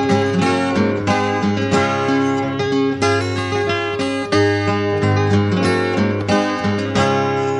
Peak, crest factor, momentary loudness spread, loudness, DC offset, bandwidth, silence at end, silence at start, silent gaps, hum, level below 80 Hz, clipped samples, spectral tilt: -4 dBFS; 14 dB; 3 LU; -17 LUFS; under 0.1%; 11 kHz; 0 s; 0 s; none; none; -48 dBFS; under 0.1%; -6 dB/octave